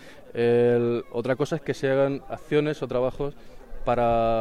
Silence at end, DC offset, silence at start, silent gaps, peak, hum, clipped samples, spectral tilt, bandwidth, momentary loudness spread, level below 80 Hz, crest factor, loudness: 0 s; 0.4%; 0 s; none; -10 dBFS; none; under 0.1%; -7 dB/octave; 12 kHz; 12 LU; -42 dBFS; 14 dB; -25 LUFS